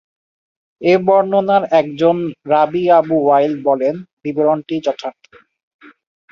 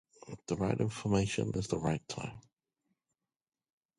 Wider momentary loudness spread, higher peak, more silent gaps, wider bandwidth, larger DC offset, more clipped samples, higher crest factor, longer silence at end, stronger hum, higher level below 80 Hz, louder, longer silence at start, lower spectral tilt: second, 9 LU vs 13 LU; first, -2 dBFS vs -16 dBFS; first, 4.13-4.17 s vs none; second, 7 kHz vs 11.5 kHz; neither; neither; second, 14 dB vs 20 dB; second, 1.2 s vs 1.6 s; neither; second, -62 dBFS vs -56 dBFS; first, -15 LUFS vs -34 LUFS; first, 0.8 s vs 0.25 s; first, -7.5 dB/octave vs -6 dB/octave